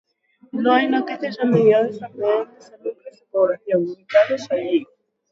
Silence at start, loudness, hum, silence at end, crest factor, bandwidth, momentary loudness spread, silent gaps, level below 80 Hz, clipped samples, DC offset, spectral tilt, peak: 0.55 s; -20 LUFS; none; 0.45 s; 18 dB; 7.6 kHz; 16 LU; none; -72 dBFS; under 0.1%; under 0.1%; -7 dB/octave; -2 dBFS